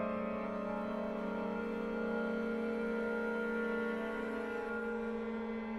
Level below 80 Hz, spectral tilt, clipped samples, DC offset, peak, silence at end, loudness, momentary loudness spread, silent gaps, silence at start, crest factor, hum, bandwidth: -62 dBFS; -7.5 dB/octave; under 0.1%; under 0.1%; -26 dBFS; 0 s; -38 LUFS; 3 LU; none; 0 s; 12 dB; none; 11.5 kHz